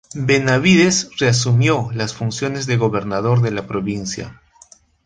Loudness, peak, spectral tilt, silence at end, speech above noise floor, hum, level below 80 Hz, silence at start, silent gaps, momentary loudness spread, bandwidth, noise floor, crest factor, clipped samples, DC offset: -17 LUFS; -2 dBFS; -5 dB/octave; 0.75 s; 32 dB; none; -48 dBFS; 0.15 s; none; 10 LU; 9.6 kHz; -49 dBFS; 16 dB; under 0.1%; under 0.1%